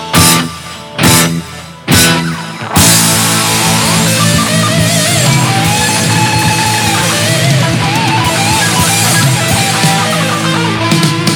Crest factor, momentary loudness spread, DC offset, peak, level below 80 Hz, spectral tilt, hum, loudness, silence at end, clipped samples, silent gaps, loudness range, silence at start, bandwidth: 10 dB; 5 LU; under 0.1%; 0 dBFS; -34 dBFS; -3 dB/octave; none; -9 LUFS; 0 s; 0.3%; none; 1 LU; 0 s; over 20 kHz